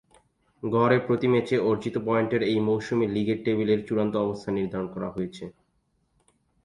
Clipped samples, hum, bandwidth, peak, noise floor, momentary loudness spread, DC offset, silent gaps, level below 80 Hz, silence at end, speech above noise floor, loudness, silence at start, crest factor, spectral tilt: under 0.1%; none; 11 kHz; -8 dBFS; -71 dBFS; 10 LU; under 0.1%; none; -60 dBFS; 1.15 s; 46 dB; -26 LUFS; 0.65 s; 20 dB; -7.5 dB/octave